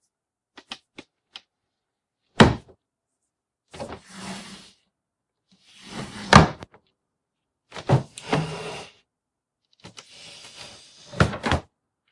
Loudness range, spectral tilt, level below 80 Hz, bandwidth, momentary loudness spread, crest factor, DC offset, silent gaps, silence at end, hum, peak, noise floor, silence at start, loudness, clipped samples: 11 LU; -5.5 dB/octave; -44 dBFS; 11.5 kHz; 29 LU; 26 dB; under 0.1%; none; 0.5 s; none; 0 dBFS; -84 dBFS; 0.7 s; -21 LUFS; under 0.1%